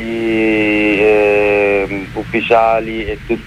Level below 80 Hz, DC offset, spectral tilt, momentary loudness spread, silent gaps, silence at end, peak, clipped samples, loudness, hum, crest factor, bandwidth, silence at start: -36 dBFS; under 0.1%; -6.5 dB/octave; 10 LU; none; 0 s; 0 dBFS; under 0.1%; -13 LUFS; none; 12 dB; 11 kHz; 0 s